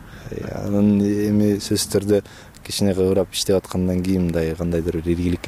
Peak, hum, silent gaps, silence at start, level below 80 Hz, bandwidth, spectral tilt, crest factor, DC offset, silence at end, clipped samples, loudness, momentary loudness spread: -8 dBFS; none; none; 0 s; -40 dBFS; 15.5 kHz; -6 dB/octave; 12 dB; under 0.1%; 0 s; under 0.1%; -20 LUFS; 10 LU